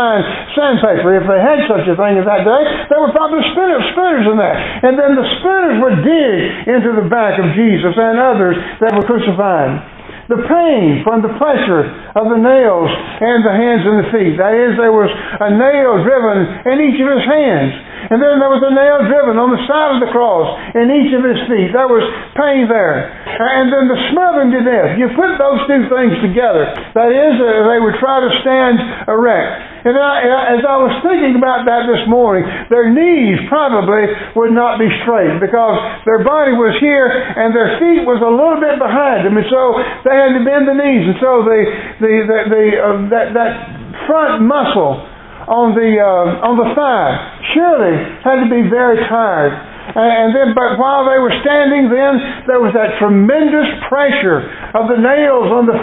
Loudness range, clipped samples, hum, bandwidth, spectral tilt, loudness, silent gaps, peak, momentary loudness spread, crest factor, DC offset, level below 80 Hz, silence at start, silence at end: 2 LU; under 0.1%; none; 4.1 kHz; -10.5 dB/octave; -11 LUFS; none; 0 dBFS; 5 LU; 10 dB; under 0.1%; -42 dBFS; 0 s; 0 s